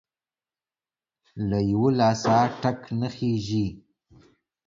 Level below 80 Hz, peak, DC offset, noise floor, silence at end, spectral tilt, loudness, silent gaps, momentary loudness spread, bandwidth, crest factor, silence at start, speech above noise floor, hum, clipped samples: -52 dBFS; -8 dBFS; under 0.1%; under -90 dBFS; 0.9 s; -7 dB/octave; -24 LUFS; none; 10 LU; 7.6 kHz; 20 dB; 1.35 s; over 67 dB; none; under 0.1%